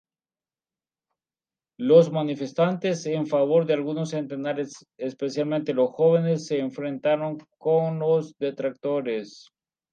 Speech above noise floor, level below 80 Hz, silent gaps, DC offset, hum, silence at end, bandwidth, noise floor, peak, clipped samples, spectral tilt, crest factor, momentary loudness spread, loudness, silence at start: over 66 dB; -78 dBFS; none; under 0.1%; none; 0.55 s; 8.8 kHz; under -90 dBFS; -4 dBFS; under 0.1%; -7 dB/octave; 20 dB; 11 LU; -24 LUFS; 1.8 s